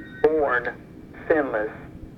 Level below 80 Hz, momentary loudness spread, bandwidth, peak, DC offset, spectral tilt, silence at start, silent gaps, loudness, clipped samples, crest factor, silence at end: -50 dBFS; 20 LU; 5.4 kHz; -6 dBFS; under 0.1%; -8 dB/octave; 0 s; none; -24 LUFS; under 0.1%; 20 dB; 0 s